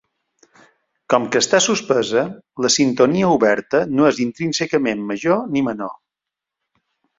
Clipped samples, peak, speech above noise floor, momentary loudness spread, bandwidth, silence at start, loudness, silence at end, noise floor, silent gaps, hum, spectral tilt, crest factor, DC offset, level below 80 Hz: under 0.1%; -2 dBFS; 67 dB; 7 LU; 7.8 kHz; 1.1 s; -18 LUFS; 1.25 s; -85 dBFS; none; none; -4 dB/octave; 18 dB; under 0.1%; -60 dBFS